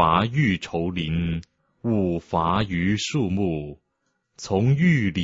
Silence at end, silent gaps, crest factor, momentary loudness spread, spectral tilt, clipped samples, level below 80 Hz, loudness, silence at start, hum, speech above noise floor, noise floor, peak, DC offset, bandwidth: 0 s; none; 20 dB; 12 LU; -6.5 dB/octave; under 0.1%; -46 dBFS; -23 LUFS; 0 s; none; 52 dB; -74 dBFS; -4 dBFS; under 0.1%; 8 kHz